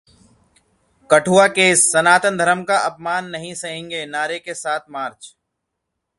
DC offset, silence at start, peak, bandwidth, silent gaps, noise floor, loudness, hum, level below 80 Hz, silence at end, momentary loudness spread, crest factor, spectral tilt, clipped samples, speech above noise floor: under 0.1%; 1.1 s; 0 dBFS; 11.5 kHz; none; -78 dBFS; -17 LUFS; none; -62 dBFS; 0.9 s; 16 LU; 20 dB; -2.5 dB/octave; under 0.1%; 60 dB